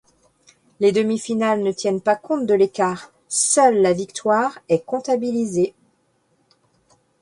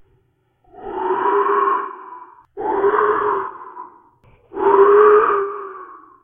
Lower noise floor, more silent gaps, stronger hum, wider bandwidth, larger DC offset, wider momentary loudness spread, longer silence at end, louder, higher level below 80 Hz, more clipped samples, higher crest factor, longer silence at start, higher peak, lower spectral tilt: about the same, -65 dBFS vs -62 dBFS; neither; neither; first, 11.5 kHz vs 3.6 kHz; neither; second, 8 LU vs 25 LU; first, 1.5 s vs 0.3 s; second, -20 LUFS vs -16 LUFS; second, -62 dBFS vs -56 dBFS; neither; about the same, 18 dB vs 18 dB; about the same, 0.8 s vs 0.8 s; about the same, -2 dBFS vs 0 dBFS; second, -4 dB/octave vs -9 dB/octave